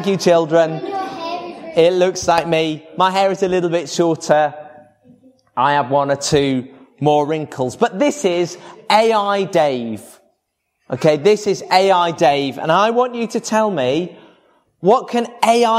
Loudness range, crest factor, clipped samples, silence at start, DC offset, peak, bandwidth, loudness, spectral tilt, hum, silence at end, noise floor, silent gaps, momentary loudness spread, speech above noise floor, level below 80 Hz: 2 LU; 16 dB; under 0.1%; 0 s; under 0.1%; 0 dBFS; 15.5 kHz; -16 LUFS; -4.5 dB/octave; none; 0 s; -71 dBFS; none; 11 LU; 55 dB; -56 dBFS